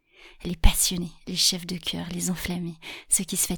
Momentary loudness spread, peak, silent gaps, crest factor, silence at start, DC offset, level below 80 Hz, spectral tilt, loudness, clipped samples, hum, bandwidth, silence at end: 13 LU; -2 dBFS; none; 24 dB; 0.25 s; under 0.1%; -30 dBFS; -2.5 dB/octave; -25 LUFS; under 0.1%; none; 19 kHz; 0 s